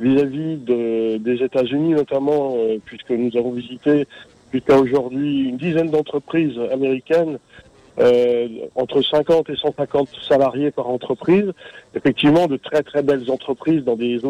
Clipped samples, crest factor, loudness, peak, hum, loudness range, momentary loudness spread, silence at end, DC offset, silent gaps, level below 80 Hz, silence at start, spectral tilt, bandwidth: under 0.1%; 14 dB; -19 LUFS; -4 dBFS; none; 2 LU; 9 LU; 0 s; under 0.1%; none; -56 dBFS; 0 s; -7.5 dB/octave; 10 kHz